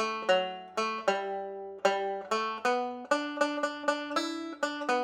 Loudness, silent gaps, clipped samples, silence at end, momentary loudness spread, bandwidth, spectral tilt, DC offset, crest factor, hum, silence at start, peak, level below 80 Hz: -31 LUFS; none; under 0.1%; 0 s; 6 LU; 14 kHz; -3 dB/octave; under 0.1%; 20 dB; none; 0 s; -12 dBFS; -84 dBFS